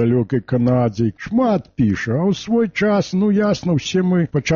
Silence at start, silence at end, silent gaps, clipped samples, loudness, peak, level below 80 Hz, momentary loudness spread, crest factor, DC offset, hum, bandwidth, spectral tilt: 0 s; 0 s; none; under 0.1%; -18 LUFS; -6 dBFS; -46 dBFS; 3 LU; 10 dB; under 0.1%; none; 7.2 kHz; -6.5 dB/octave